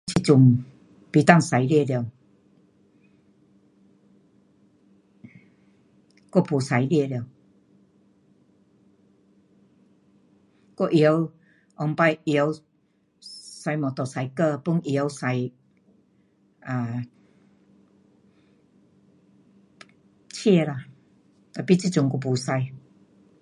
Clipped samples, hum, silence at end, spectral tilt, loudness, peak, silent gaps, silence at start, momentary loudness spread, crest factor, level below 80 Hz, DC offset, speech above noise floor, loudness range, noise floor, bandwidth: under 0.1%; none; 0.65 s; -6.5 dB/octave; -23 LUFS; 0 dBFS; none; 0.05 s; 20 LU; 26 dB; -64 dBFS; under 0.1%; 45 dB; 14 LU; -66 dBFS; 11.5 kHz